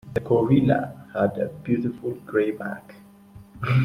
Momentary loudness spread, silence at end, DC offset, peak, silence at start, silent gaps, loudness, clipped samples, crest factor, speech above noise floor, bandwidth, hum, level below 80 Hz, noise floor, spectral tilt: 13 LU; 0 s; under 0.1%; -6 dBFS; 0.05 s; none; -24 LUFS; under 0.1%; 18 dB; 24 dB; 11.5 kHz; none; -54 dBFS; -47 dBFS; -9.5 dB/octave